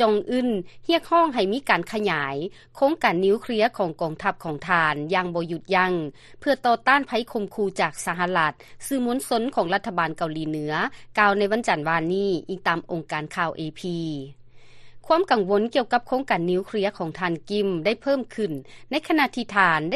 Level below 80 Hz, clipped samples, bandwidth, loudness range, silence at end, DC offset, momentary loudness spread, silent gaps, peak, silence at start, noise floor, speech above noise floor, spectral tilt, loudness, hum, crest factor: -58 dBFS; under 0.1%; 13 kHz; 3 LU; 0 s; under 0.1%; 9 LU; none; -4 dBFS; 0 s; -44 dBFS; 20 dB; -5 dB/octave; -24 LUFS; none; 20 dB